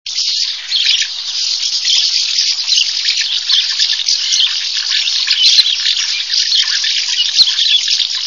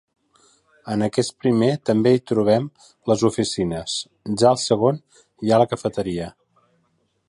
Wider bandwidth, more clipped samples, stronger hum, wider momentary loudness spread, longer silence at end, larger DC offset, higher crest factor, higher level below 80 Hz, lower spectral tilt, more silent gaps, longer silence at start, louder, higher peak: about the same, 11 kHz vs 11.5 kHz; neither; neither; second, 5 LU vs 11 LU; second, 0 s vs 1 s; first, 0.5% vs under 0.1%; about the same, 14 dB vs 18 dB; second, -64 dBFS vs -54 dBFS; second, 6.5 dB/octave vs -5.5 dB/octave; neither; second, 0.05 s vs 0.85 s; first, -11 LUFS vs -21 LUFS; about the same, 0 dBFS vs -2 dBFS